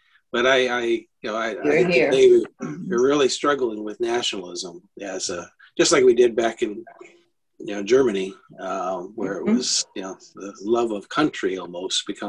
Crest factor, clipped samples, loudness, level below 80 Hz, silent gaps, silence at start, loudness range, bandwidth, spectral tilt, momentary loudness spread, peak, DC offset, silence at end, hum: 18 dB; under 0.1%; -21 LUFS; -62 dBFS; none; 0.35 s; 5 LU; 10.5 kHz; -3.5 dB/octave; 17 LU; -4 dBFS; under 0.1%; 0 s; none